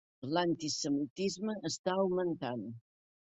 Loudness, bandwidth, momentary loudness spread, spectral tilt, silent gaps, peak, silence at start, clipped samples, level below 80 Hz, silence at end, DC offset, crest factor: -35 LUFS; 8.4 kHz; 8 LU; -4.5 dB/octave; 1.10-1.16 s, 1.79-1.84 s; -16 dBFS; 0.2 s; under 0.1%; -74 dBFS; 0.45 s; under 0.1%; 20 dB